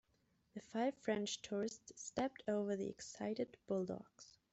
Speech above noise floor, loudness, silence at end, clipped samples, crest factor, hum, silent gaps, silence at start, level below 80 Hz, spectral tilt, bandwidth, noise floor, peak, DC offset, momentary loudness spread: 36 dB; -43 LUFS; 0.25 s; under 0.1%; 20 dB; none; none; 0.55 s; -78 dBFS; -4.5 dB/octave; 8.2 kHz; -79 dBFS; -24 dBFS; under 0.1%; 11 LU